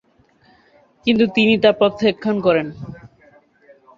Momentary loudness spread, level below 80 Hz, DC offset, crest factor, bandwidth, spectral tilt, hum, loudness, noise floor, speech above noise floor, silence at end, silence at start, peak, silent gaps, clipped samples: 16 LU; -54 dBFS; under 0.1%; 18 dB; 7.4 kHz; -7 dB/octave; none; -17 LUFS; -56 dBFS; 39 dB; 1.05 s; 1.05 s; -2 dBFS; none; under 0.1%